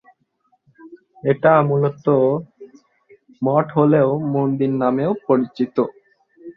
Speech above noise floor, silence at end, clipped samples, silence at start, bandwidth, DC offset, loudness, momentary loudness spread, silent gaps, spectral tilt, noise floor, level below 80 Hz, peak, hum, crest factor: 48 dB; 0.05 s; under 0.1%; 0.85 s; 5.8 kHz; under 0.1%; -18 LUFS; 8 LU; none; -10.5 dB/octave; -65 dBFS; -62 dBFS; -2 dBFS; none; 18 dB